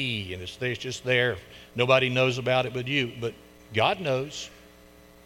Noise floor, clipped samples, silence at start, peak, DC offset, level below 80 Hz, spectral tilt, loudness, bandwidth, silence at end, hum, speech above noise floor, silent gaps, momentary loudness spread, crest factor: -52 dBFS; under 0.1%; 0 s; -6 dBFS; under 0.1%; -58 dBFS; -5 dB/octave; -26 LUFS; 17 kHz; 0.7 s; none; 26 dB; none; 14 LU; 20 dB